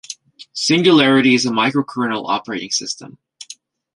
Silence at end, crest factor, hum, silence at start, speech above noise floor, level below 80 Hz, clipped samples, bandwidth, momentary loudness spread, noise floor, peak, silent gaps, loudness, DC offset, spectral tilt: 0.45 s; 16 dB; none; 0.1 s; 26 dB; -62 dBFS; under 0.1%; 11.5 kHz; 22 LU; -42 dBFS; -2 dBFS; none; -16 LUFS; under 0.1%; -4 dB/octave